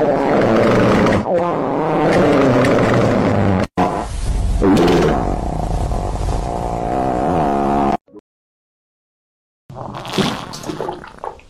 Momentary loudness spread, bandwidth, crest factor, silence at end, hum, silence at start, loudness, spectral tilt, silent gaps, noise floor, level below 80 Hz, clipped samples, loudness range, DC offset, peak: 13 LU; 15 kHz; 14 dB; 0.15 s; none; 0 s; -16 LUFS; -6.5 dB/octave; 8.01-8.05 s, 8.20-9.69 s; under -90 dBFS; -28 dBFS; under 0.1%; 9 LU; under 0.1%; -4 dBFS